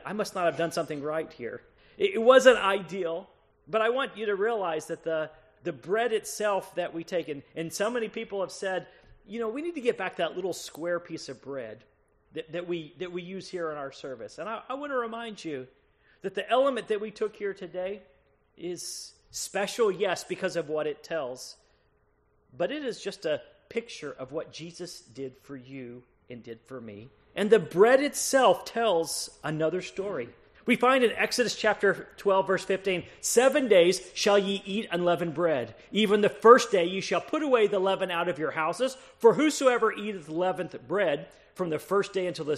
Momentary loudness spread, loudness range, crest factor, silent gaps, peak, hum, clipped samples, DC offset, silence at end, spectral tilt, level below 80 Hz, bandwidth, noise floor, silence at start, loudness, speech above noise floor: 18 LU; 12 LU; 24 dB; none; -4 dBFS; none; under 0.1%; under 0.1%; 0 s; -3.5 dB/octave; -68 dBFS; 13.5 kHz; -68 dBFS; 0.05 s; -27 LUFS; 40 dB